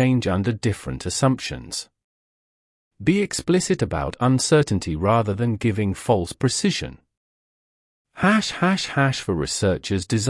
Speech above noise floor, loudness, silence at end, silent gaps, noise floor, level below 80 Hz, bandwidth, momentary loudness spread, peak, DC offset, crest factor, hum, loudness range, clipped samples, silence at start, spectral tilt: over 69 dB; -22 LUFS; 0 s; 2.04-2.91 s, 7.17-8.05 s; under -90 dBFS; -46 dBFS; 12 kHz; 8 LU; -4 dBFS; under 0.1%; 18 dB; none; 4 LU; under 0.1%; 0 s; -5 dB/octave